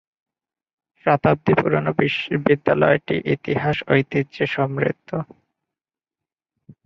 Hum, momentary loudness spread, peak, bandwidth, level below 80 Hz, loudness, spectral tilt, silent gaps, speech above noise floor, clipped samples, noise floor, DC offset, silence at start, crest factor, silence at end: none; 8 LU; -2 dBFS; 6.4 kHz; -54 dBFS; -20 LUFS; -8.5 dB/octave; none; over 70 dB; under 0.1%; under -90 dBFS; under 0.1%; 1.05 s; 20 dB; 1.6 s